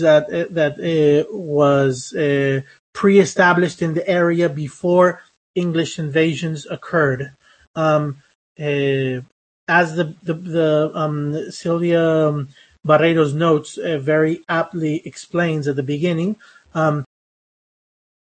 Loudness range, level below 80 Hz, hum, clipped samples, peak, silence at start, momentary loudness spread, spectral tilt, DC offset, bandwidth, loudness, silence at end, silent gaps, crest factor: 5 LU; -62 dBFS; none; under 0.1%; 0 dBFS; 0 s; 12 LU; -6.5 dB/octave; under 0.1%; 8.8 kHz; -18 LUFS; 1.35 s; 2.79-2.93 s, 5.37-5.54 s, 7.67-7.74 s, 8.35-8.55 s, 9.32-9.67 s; 18 dB